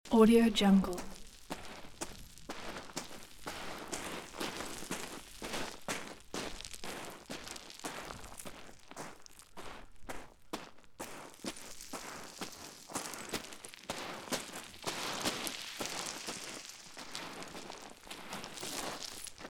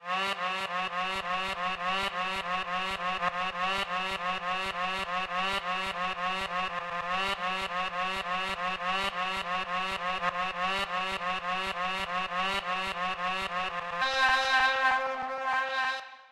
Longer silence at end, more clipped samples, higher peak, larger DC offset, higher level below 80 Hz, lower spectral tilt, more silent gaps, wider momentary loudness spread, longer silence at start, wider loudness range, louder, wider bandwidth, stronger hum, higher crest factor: about the same, 0 s vs 0 s; neither; about the same, -12 dBFS vs -12 dBFS; second, under 0.1% vs 0.2%; about the same, -58 dBFS vs -58 dBFS; first, -4 dB/octave vs -2.5 dB/octave; neither; first, 13 LU vs 5 LU; about the same, 0.05 s vs 0 s; first, 8 LU vs 3 LU; second, -38 LUFS vs -30 LUFS; first, 18 kHz vs 14 kHz; neither; first, 26 dB vs 18 dB